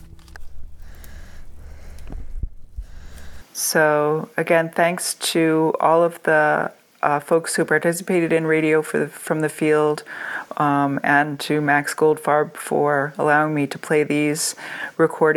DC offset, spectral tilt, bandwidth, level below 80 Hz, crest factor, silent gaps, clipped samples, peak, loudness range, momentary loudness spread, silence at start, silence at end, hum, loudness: under 0.1%; -4.5 dB/octave; 18.5 kHz; -42 dBFS; 20 dB; none; under 0.1%; -2 dBFS; 5 LU; 12 LU; 0 s; 0 s; none; -20 LUFS